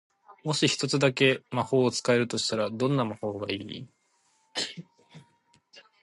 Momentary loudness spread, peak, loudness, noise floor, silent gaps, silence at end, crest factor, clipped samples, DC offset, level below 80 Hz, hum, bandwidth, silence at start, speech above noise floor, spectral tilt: 12 LU; -8 dBFS; -27 LUFS; -69 dBFS; none; 0.25 s; 20 dB; under 0.1%; under 0.1%; -68 dBFS; none; 11.5 kHz; 0.3 s; 42 dB; -4.5 dB/octave